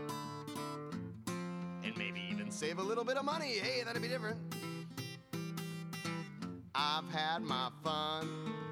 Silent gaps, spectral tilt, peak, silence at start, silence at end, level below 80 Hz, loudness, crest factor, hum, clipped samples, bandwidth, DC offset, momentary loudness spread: none; -4.5 dB/octave; -22 dBFS; 0 s; 0 s; -78 dBFS; -39 LUFS; 18 dB; none; under 0.1%; 17.5 kHz; under 0.1%; 8 LU